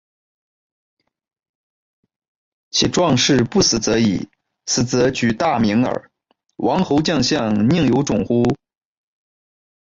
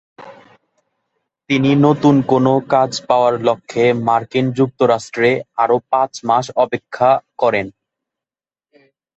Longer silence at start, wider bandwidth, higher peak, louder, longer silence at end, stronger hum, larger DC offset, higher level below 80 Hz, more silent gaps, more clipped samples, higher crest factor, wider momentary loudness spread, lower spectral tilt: first, 2.75 s vs 0.2 s; about the same, 7.8 kHz vs 8.2 kHz; second, -4 dBFS vs 0 dBFS; about the same, -17 LUFS vs -16 LUFS; second, 1.25 s vs 1.45 s; neither; neither; first, -46 dBFS vs -58 dBFS; neither; neither; about the same, 16 dB vs 16 dB; about the same, 8 LU vs 6 LU; second, -4.5 dB/octave vs -6.5 dB/octave